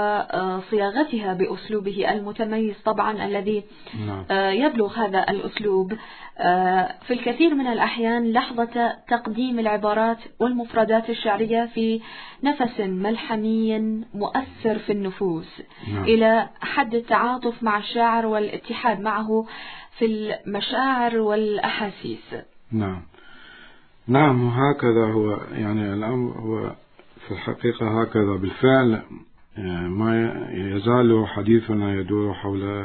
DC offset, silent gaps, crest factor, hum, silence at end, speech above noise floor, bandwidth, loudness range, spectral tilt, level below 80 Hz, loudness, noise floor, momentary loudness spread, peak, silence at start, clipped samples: under 0.1%; none; 18 dB; none; 0 s; 26 dB; 4.5 kHz; 3 LU; -10.5 dB/octave; -56 dBFS; -23 LUFS; -48 dBFS; 11 LU; -4 dBFS; 0 s; under 0.1%